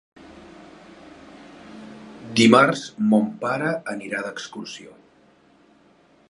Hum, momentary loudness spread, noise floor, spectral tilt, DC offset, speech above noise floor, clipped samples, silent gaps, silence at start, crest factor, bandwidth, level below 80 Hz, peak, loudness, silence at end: none; 27 LU; -56 dBFS; -5 dB/octave; under 0.1%; 36 dB; under 0.1%; none; 0.35 s; 24 dB; 11.5 kHz; -64 dBFS; 0 dBFS; -20 LUFS; 1.4 s